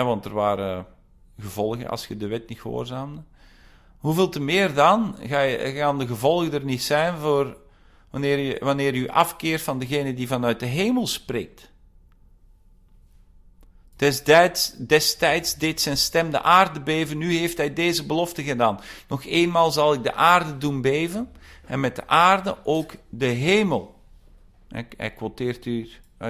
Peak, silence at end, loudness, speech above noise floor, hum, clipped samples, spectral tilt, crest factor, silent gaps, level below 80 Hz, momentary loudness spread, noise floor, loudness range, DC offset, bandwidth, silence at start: -4 dBFS; 0 s; -22 LUFS; 31 dB; none; under 0.1%; -4.5 dB/octave; 20 dB; none; -52 dBFS; 14 LU; -53 dBFS; 8 LU; under 0.1%; 16 kHz; 0 s